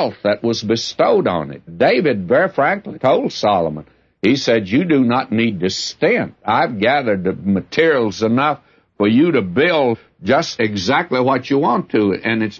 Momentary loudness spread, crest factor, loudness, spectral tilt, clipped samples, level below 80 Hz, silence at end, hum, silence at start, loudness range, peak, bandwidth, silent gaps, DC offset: 5 LU; 14 dB; -17 LUFS; -5.5 dB/octave; under 0.1%; -56 dBFS; 0 s; none; 0 s; 1 LU; -2 dBFS; 7.6 kHz; none; under 0.1%